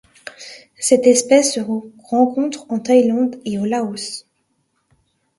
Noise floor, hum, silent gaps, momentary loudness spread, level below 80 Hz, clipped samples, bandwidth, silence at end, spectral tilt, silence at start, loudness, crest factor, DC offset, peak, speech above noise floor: -67 dBFS; none; none; 21 LU; -64 dBFS; under 0.1%; 11.5 kHz; 1.2 s; -3.5 dB/octave; 0.25 s; -17 LUFS; 18 dB; under 0.1%; 0 dBFS; 51 dB